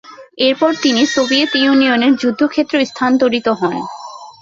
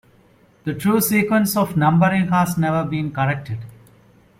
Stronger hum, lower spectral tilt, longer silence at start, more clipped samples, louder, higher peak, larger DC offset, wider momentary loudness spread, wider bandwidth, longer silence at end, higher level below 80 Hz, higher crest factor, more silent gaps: neither; second, -3.5 dB/octave vs -6 dB/octave; second, 0.1 s vs 0.65 s; neither; first, -14 LUFS vs -19 LUFS; about the same, -2 dBFS vs -4 dBFS; neither; second, 9 LU vs 12 LU; second, 7.6 kHz vs 16.5 kHz; second, 0.1 s vs 0.65 s; about the same, -56 dBFS vs -54 dBFS; about the same, 12 dB vs 16 dB; neither